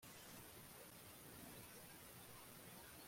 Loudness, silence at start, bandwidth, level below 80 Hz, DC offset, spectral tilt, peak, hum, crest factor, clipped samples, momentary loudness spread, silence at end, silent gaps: -58 LUFS; 0 s; 16.5 kHz; -78 dBFS; under 0.1%; -3 dB/octave; -44 dBFS; none; 14 dB; under 0.1%; 1 LU; 0 s; none